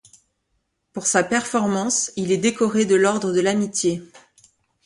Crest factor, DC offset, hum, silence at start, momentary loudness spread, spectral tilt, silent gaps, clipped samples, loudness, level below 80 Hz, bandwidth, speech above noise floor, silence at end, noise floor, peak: 18 dB; under 0.1%; none; 0.95 s; 6 LU; -4 dB/octave; none; under 0.1%; -20 LUFS; -62 dBFS; 11.5 kHz; 52 dB; 0.7 s; -72 dBFS; -4 dBFS